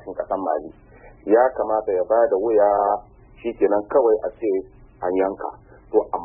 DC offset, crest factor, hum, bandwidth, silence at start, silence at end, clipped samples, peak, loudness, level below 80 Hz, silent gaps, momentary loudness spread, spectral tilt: under 0.1%; 16 dB; none; 3.2 kHz; 0.05 s; 0 s; under 0.1%; -4 dBFS; -21 LUFS; -52 dBFS; none; 13 LU; -11 dB/octave